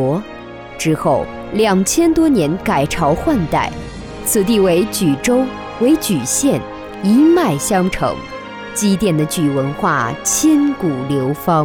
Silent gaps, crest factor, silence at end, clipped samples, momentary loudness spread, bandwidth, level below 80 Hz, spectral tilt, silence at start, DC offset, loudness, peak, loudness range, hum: none; 12 dB; 0 s; under 0.1%; 10 LU; 19 kHz; -38 dBFS; -5 dB/octave; 0 s; under 0.1%; -15 LUFS; -4 dBFS; 1 LU; none